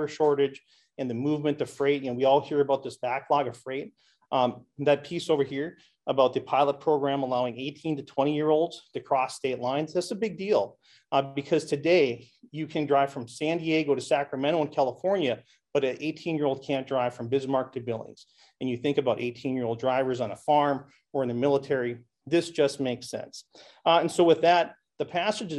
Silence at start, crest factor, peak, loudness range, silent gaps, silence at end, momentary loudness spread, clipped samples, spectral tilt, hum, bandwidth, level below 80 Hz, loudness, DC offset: 0 s; 18 dB; -8 dBFS; 3 LU; none; 0 s; 11 LU; under 0.1%; -5.5 dB/octave; none; 12 kHz; -72 dBFS; -27 LUFS; under 0.1%